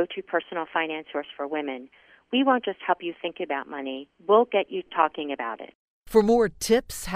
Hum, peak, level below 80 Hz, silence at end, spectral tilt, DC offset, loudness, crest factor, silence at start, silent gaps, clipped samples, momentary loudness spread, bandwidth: none; -6 dBFS; -54 dBFS; 0 s; -4 dB/octave; under 0.1%; -26 LUFS; 20 dB; 0 s; 5.75-6.04 s; under 0.1%; 13 LU; 15.5 kHz